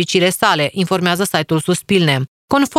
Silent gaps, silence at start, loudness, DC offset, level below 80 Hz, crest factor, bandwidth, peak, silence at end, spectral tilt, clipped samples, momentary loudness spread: 2.28-2.48 s; 0 s; -16 LUFS; under 0.1%; -52 dBFS; 16 dB; 16 kHz; 0 dBFS; 0 s; -4.5 dB/octave; under 0.1%; 4 LU